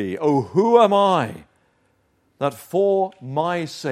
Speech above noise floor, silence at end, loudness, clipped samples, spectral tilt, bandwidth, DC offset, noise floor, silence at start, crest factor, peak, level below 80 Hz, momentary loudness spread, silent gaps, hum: 45 dB; 0 s; -20 LUFS; under 0.1%; -6.5 dB/octave; 15 kHz; under 0.1%; -64 dBFS; 0 s; 18 dB; -2 dBFS; -68 dBFS; 12 LU; none; none